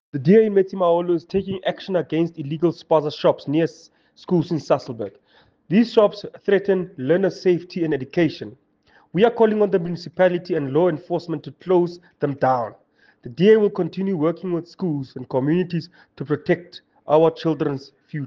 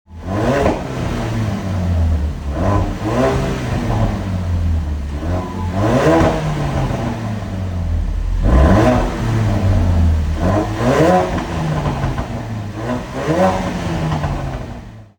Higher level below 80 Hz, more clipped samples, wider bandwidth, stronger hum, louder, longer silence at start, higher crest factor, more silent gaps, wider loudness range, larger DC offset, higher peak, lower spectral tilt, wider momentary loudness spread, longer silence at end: second, -62 dBFS vs -24 dBFS; neither; second, 7.2 kHz vs 18.5 kHz; neither; second, -21 LUFS vs -18 LUFS; about the same, 0.15 s vs 0.1 s; about the same, 18 dB vs 16 dB; neither; about the same, 2 LU vs 4 LU; neither; about the same, -4 dBFS vs -2 dBFS; about the same, -8 dB/octave vs -7 dB/octave; about the same, 12 LU vs 10 LU; second, 0 s vs 0.15 s